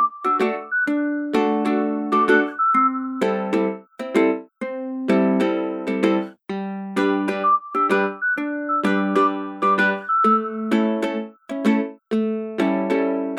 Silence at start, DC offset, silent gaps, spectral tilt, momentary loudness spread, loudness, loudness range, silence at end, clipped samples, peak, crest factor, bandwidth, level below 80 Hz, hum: 0 s; under 0.1%; none; -6.5 dB/octave; 9 LU; -21 LUFS; 2 LU; 0 s; under 0.1%; -4 dBFS; 16 dB; 12.5 kHz; -70 dBFS; none